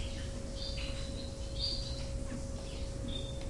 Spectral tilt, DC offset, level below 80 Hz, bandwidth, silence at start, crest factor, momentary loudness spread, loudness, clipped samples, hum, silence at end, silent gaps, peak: -4.5 dB/octave; under 0.1%; -42 dBFS; 11.5 kHz; 0 s; 14 dB; 7 LU; -40 LUFS; under 0.1%; none; 0 s; none; -24 dBFS